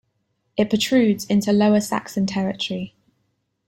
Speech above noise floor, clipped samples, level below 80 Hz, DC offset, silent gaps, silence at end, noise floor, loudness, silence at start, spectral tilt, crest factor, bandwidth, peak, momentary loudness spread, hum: 52 dB; under 0.1%; -58 dBFS; under 0.1%; none; 0.8 s; -71 dBFS; -21 LUFS; 0.55 s; -5.5 dB/octave; 16 dB; 16.5 kHz; -6 dBFS; 11 LU; none